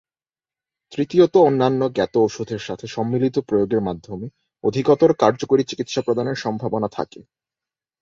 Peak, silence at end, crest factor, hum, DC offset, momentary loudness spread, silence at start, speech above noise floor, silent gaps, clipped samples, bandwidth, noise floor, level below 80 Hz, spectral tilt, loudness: -2 dBFS; 0.8 s; 18 dB; none; under 0.1%; 14 LU; 0.9 s; over 71 dB; none; under 0.1%; 7.6 kHz; under -90 dBFS; -56 dBFS; -6.5 dB/octave; -20 LUFS